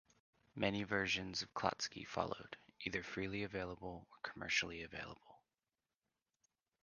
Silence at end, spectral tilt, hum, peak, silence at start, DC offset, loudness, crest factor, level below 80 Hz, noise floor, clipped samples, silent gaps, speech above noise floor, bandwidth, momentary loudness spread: 1.45 s; -3.5 dB/octave; none; -20 dBFS; 0.55 s; under 0.1%; -42 LUFS; 26 dB; -68 dBFS; under -90 dBFS; under 0.1%; none; over 47 dB; 9.6 kHz; 13 LU